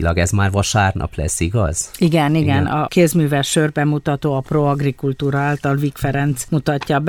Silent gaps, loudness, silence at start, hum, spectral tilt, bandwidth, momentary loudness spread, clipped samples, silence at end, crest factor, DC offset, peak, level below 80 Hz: none; -17 LUFS; 0 s; none; -5.5 dB/octave; 17.5 kHz; 5 LU; under 0.1%; 0 s; 14 dB; under 0.1%; -2 dBFS; -34 dBFS